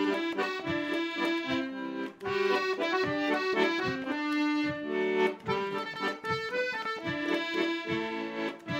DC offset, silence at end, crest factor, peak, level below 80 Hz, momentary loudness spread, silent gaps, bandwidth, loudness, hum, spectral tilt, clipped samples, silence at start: under 0.1%; 0 s; 16 dB; -14 dBFS; -70 dBFS; 6 LU; none; 16 kHz; -31 LUFS; none; -5 dB/octave; under 0.1%; 0 s